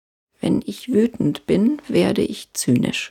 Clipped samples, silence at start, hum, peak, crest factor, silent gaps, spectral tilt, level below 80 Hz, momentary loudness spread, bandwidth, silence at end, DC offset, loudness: under 0.1%; 0.45 s; none; -6 dBFS; 14 dB; none; -5.5 dB/octave; -52 dBFS; 5 LU; 16.5 kHz; 0 s; under 0.1%; -20 LUFS